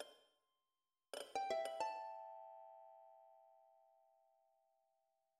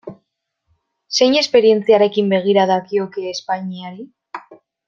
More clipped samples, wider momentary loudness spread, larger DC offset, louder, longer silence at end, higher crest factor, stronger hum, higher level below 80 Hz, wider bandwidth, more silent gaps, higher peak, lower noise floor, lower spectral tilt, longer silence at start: neither; about the same, 23 LU vs 22 LU; neither; second, -48 LUFS vs -16 LUFS; first, 1.55 s vs 0.35 s; first, 24 dB vs 16 dB; neither; second, under -90 dBFS vs -66 dBFS; first, 14.5 kHz vs 7.4 kHz; neither; second, -28 dBFS vs -2 dBFS; first, under -90 dBFS vs -73 dBFS; second, -1.5 dB/octave vs -4.5 dB/octave; about the same, 0 s vs 0.05 s